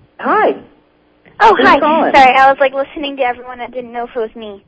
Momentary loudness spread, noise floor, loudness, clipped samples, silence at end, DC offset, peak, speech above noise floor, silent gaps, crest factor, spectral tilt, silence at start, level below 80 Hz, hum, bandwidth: 17 LU; -52 dBFS; -11 LUFS; 0.8%; 0.1 s; under 0.1%; 0 dBFS; 40 dB; none; 12 dB; -4.5 dB/octave; 0.2 s; -46 dBFS; none; 8 kHz